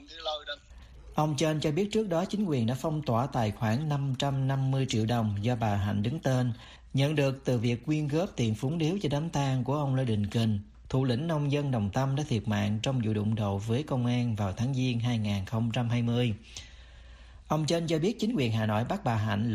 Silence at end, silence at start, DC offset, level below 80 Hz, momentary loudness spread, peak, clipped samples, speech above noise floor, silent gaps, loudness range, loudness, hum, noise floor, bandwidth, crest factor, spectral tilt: 0 s; 0 s; under 0.1%; -54 dBFS; 3 LU; -12 dBFS; under 0.1%; 21 dB; none; 2 LU; -29 LUFS; none; -50 dBFS; 15 kHz; 16 dB; -6.5 dB/octave